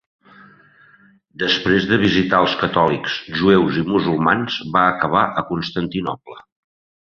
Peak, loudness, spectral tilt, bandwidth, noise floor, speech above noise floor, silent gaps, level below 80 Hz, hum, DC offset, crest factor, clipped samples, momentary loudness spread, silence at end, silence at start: -2 dBFS; -18 LUFS; -6.5 dB/octave; 6.8 kHz; -52 dBFS; 34 dB; none; -48 dBFS; none; under 0.1%; 18 dB; under 0.1%; 8 LU; 0.6 s; 1.4 s